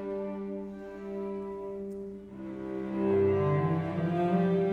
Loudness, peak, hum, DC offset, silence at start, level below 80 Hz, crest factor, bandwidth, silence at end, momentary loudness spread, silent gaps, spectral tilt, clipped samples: -31 LUFS; -16 dBFS; none; under 0.1%; 0 s; -62 dBFS; 14 dB; 5 kHz; 0 s; 15 LU; none; -10 dB/octave; under 0.1%